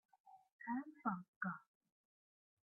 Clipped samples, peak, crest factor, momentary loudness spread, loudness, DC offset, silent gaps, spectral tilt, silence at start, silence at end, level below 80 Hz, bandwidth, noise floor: under 0.1%; -28 dBFS; 22 dB; 9 LU; -47 LUFS; under 0.1%; 0.52-0.59 s, 1.28-1.41 s; -2.5 dB/octave; 0.25 s; 1.05 s; under -90 dBFS; 2.4 kHz; under -90 dBFS